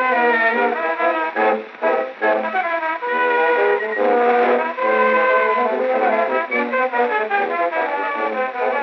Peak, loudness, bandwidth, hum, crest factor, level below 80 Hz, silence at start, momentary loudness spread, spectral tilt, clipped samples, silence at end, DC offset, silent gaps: -4 dBFS; -18 LUFS; 6 kHz; none; 14 dB; under -90 dBFS; 0 s; 6 LU; -0.5 dB/octave; under 0.1%; 0 s; under 0.1%; none